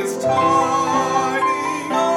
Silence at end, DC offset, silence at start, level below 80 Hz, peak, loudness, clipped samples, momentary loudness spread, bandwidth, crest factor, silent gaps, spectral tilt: 0 s; under 0.1%; 0 s; -60 dBFS; -4 dBFS; -18 LUFS; under 0.1%; 4 LU; 16.5 kHz; 14 dB; none; -4 dB/octave